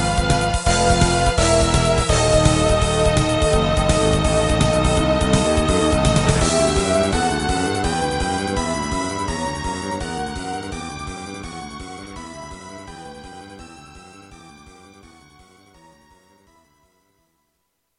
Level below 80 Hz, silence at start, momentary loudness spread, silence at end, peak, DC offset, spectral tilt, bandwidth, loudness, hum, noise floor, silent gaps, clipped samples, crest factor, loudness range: -28 dBFS; 0 s; 19 LU; 3.45 s; -2 dBFS; under 0.1%; -4.5 dB/octave; 12 kHz; -18 LUFS; none; -72 dBFS; none; under 0.1%; 18 dB; 19 LU